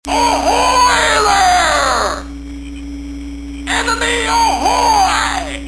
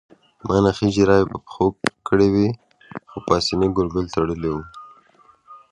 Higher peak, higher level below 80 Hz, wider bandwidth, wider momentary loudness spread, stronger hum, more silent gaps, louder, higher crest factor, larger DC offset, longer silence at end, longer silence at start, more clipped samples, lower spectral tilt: about the same, 0 dBFS vs 0 dBFS; first, -30 dBFS vs -42 dBFS; about the same, 11 kHz vs 11.5 kHz; about the same, 17 LU vs 18 LU; neither; neither; first, -12 LUFS vs -20 LUFS; second, 14 dB vs 20 dB; first, 0.5% vs under 0.1%; second, 0 s vs 0.15 s; second, 0.05 s vs 0.45 s; neither; second, -2 dB/octave vs -6 dB/octave